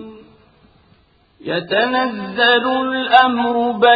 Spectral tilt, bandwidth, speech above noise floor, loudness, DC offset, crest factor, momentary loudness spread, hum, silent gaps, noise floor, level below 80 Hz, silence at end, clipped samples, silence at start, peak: -6.5 dB/octave; 5 kHz; 39 dB; -16 LUFS; under 0.1%; 18 dB; 11 LU; none; none; -54 dBFS; -58 dBFS; 0 s; under 0.1%; 0 s; 0 dBFS